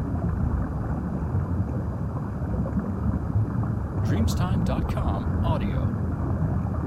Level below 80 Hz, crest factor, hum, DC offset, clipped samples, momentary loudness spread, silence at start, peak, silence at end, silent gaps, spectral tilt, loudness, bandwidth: -32 dBFS; 14 dB; none; under 0.1%; under 0.1%; 5 LU; 0 s; -12 dBFS; 0 s; none; -8 dB/octave; -27 LUFS; 13 kHz